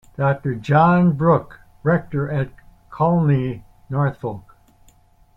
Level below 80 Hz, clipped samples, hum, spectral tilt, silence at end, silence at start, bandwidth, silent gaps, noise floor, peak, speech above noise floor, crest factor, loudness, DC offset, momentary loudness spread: -48 dBFS; under 0.1%; none; -10 dB/octave; 0.95 s; 0.2 s; 5.2 kHz; none; -53 dBFS; -4 dBFS; 35 dB; 16 dB; -19 LUFS; under 0.1%; 15 LU